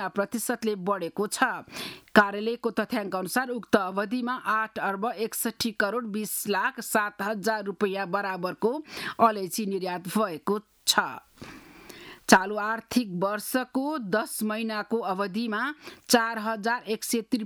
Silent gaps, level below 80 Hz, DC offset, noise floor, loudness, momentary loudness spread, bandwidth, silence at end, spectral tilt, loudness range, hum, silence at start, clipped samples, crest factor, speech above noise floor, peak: none; -66 dBFS; under 0.1%; -47 dBFS; -27 LUFS; 8 LU; over 20 kHz; 0 s; -3.5 dB/octave; 2 LU; none; 0 s; under 0.1%; 26 dB; 19 dB; -2 dBFS